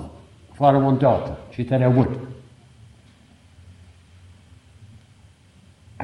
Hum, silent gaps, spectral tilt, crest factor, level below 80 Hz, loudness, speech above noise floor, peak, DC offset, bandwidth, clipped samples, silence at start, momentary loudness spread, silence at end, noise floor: none; none; -9.5 dB/octave; 20 dB; -50 dBFS; -20 LUFS; 34 dB; -4 dBFS; under 0.1%; 5.6 kHz; under 0.1%; 0 s; 21 LU; 0 s; -52 dBFS